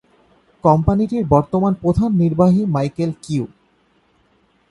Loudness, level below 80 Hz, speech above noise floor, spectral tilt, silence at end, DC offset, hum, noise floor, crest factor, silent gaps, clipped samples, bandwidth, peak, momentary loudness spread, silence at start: -17 LUFS; -38 dBFS; 43 dB; -9.5 dB/octave; 1.25 s; under 0.1%; none; -59 dBFS; 18 dB; none; under 0.1%; 11 kHz; 0 dBFS; 9 LU; 0.65 s